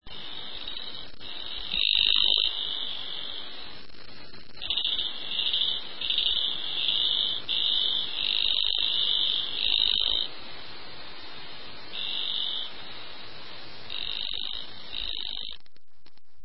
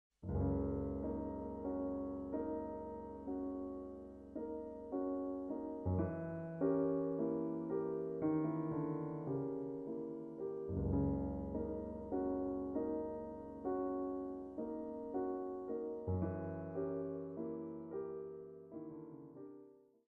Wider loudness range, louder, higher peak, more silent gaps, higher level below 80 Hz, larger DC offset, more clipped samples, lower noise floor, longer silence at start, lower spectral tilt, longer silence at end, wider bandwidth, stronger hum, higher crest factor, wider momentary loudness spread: first, 10 LU vs 6 LU; first, -26 LUFS vs -42 LUFS; first, -8 dBFS vs -24 dBFS; neither; about the same, -56 dBFS vs -56 dBFS; first, 2% vs under 0.1%; neither; about the same, -64 dBFS vs -62 dBFS; second, 0 s vs 0.2 s; second, -5 dB/octave vs -12 dB/octave; second, 0 s vs 0.3 s; first, 5.8 kHz vs 2.7 kHz; neither; first, 22 dB vs 16 dB; first, 20 LU vs 11 LU